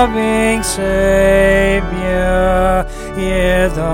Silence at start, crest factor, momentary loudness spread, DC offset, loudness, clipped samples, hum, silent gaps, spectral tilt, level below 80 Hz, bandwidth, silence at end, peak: 0 s; 12 dB; 7 LU; under 0.1%; -14 LUFS; under 0.1%; none; none; -5 dB/octave; -22 dBFS; 17 kHz; 0 s; 0 dBFS